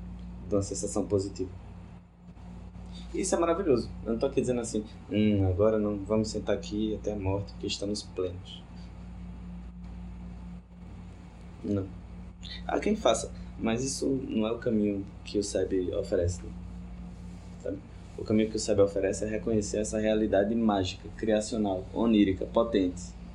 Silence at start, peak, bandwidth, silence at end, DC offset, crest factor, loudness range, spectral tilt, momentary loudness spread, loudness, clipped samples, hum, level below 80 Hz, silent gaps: 0 s; -10 dBFS; 11.5 kHz; 0 s; under 0.1%; 20 dB; 11 LU; -5.5 dB/octave; 19 LU; -29 LUFS; under 0.1%; none; -46 dBFS; none